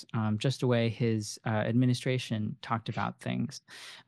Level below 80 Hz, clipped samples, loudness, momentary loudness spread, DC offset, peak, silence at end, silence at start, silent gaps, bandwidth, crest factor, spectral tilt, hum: -70 dBFS; under 0.1%; -31 LUFS; 8 LU; under 0.1%; -14 dBFS; 0.05 s; 0 s; none; 12.5 kHz; 16 dB; -6 dB/octave; none